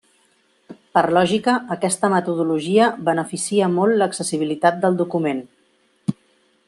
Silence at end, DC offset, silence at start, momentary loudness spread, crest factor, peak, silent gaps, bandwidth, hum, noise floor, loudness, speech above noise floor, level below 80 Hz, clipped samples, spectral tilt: 0.55 s; under 0.1%; 0.7 s; 8 LU; 18 dB; -2 dBFS; none; 12.5 kHz; none; -61 dBFS; -20 LUFS; 43 dB; -66 dBFS; under 0.1%; -5 dB/octave